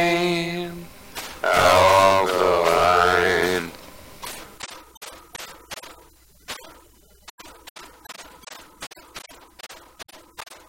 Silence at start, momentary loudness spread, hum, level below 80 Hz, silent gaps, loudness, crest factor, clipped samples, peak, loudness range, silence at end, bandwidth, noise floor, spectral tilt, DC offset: 0 s; 26 LU; none; -52 dBFS; 4.97-5.01 s, 7.30-7.38 s, 7.70-7.75 s; -18 LUFS; 18 dB; under 0.1%; -4 dBFS; 23 LU; 0.15 s; 16.5 kHz; -53 dBFS; -3.5 dB/octave; under 0.1%